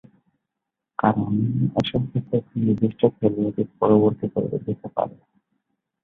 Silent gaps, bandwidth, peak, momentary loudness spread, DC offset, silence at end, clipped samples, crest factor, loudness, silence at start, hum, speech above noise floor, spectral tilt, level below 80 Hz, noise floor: none; 6.8 kHz; -2 dBFS; 9 LU; under 0.1%; 0.95 s; under 0.1%; 20 dB; -23 LUFS; 1.05 s; none; 62 dB; -9.5 dB/octave; -54 dBFS; -84 dBFS